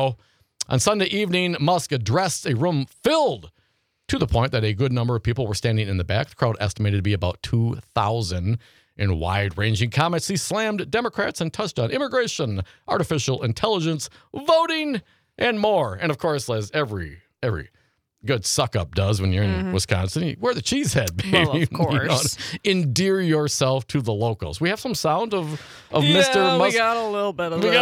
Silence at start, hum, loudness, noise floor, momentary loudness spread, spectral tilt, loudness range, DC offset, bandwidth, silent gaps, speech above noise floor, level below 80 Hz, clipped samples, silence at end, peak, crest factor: 0 s; none; -22 LUFS; -68 dBFS; 7 LU; -5 dB/octave; 4 LU; under 0.1%; 16 kHz; none; 46 dB; -48 dBFS; under 0.1%; 0 s; -2 dBFS; 20 dB